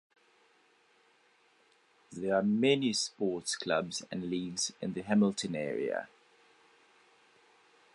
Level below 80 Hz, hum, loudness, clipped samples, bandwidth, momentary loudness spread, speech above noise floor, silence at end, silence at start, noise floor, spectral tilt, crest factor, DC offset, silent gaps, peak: -72 dBFS; none; -32 LUFS; under 0.1%; 11.5 kHz; 11 LU; 36 dB; 1.9 s; 2.1 s; -68 dBFS; -4 dB/octave; 20 dB; under 0.1%; none; -14 dBFS